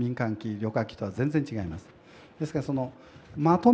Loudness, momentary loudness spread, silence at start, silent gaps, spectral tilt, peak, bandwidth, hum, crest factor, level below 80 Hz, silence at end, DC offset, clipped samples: -30 LUFS; 11 LU; 0 s; none; -8.5 dB/octave; -8 dBFS; 8.6 kHz; none; 20 dB; -58 dBFS; 0 s; under 0.1%; under 0.1%